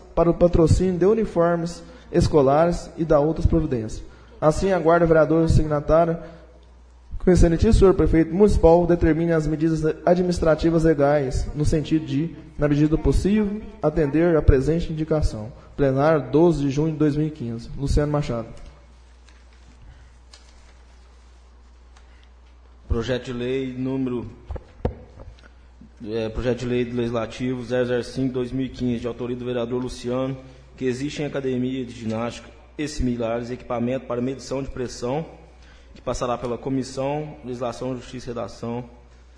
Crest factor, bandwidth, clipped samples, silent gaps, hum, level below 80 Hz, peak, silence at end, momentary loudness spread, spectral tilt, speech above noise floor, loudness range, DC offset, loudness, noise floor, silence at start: 20 dB; 10.5 kHz; under 0.1%; none; none; -32 dBFS; -2 dBFS; 0.45 s; 14 LU; -7.5 dB/octave; 27 dB; 10 LU; under 0.1%; -22 LUFS; -48 dBFS; 0 s